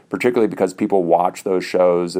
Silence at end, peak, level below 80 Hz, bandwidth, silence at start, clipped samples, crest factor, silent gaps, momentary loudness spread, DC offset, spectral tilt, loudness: 0 s; -2 dBFS; -66 dBFS; 16 kHz; 0.1 s; under 0.1%; 16 dB; none; 4 LU; under 0.1%; -6 dB/octave; -18 LUFS